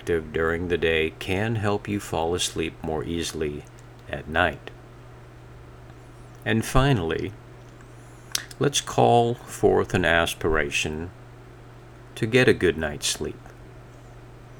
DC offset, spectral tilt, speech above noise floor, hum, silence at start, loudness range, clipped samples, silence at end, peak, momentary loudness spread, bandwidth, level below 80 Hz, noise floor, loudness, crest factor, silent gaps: under 0.1%; -4.5 dB/octave; 21 dB; none; 0 s; 7 LU; under 0.1%; 0 s; 0 dBFS; 24 LU; over 20 kHz; -42 dBFS; -45 dBFS; -24 LUFS; 26 dB; none